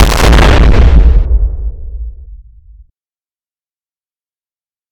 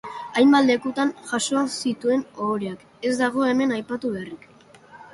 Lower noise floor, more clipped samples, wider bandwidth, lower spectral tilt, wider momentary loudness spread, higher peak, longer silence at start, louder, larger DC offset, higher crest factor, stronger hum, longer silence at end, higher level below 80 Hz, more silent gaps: first, under -90 dBFS vs -49 dBFS; neither; first, 16 kHz vs 11.5 kHz; first, -5.5 dB/octave vs -4 dB/octave; first, 19 LU vs 12 LU; first, 0 dBFS vs -6 dBFS; about the same, 0 s vs 0.05 s; first, -9 LUFS vs -22 LUFS; neither; second, 10 dB vs 18 dB; neither; first, 2.55 s vs 0.1 s; first, -10 dBFS vs -66 dBFS; neither